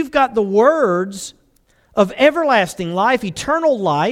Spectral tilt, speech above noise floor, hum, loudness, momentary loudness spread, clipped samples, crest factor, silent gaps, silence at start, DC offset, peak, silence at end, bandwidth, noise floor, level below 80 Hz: -5 dB/octave; 41 dB; none; -16 LUFS; 9 LU; under 0.1%; 16 dB; none; 0 s; under 0.1%; 0 dBFS; 0 s; 15.5 kHz; -57 dBFS; -50 dBFS